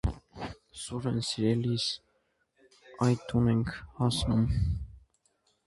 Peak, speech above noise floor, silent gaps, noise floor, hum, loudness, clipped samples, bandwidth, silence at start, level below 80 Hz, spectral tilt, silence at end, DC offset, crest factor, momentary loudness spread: -12 dBFS; 45 dB; none; -74 dBFS; none; -30 LUFS; under 0.1%; 11.5 kHz; 0.05 s; -42 dBFS; -6 dB/octave; 0.65 s; under 0.1%; 18 dB; 15 LU